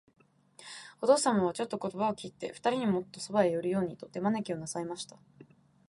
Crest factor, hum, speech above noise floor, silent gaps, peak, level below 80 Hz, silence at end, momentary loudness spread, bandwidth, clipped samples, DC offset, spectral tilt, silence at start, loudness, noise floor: 20 dB; none; 27 dB; none; -12 dBFS; -72 dBFS; 0.45 s; 16 LU; 11.5 kHz; under 0.1%; under 0.1%; -5 dB/octave; 0.6 s; -31 LUFS; -58 dBFS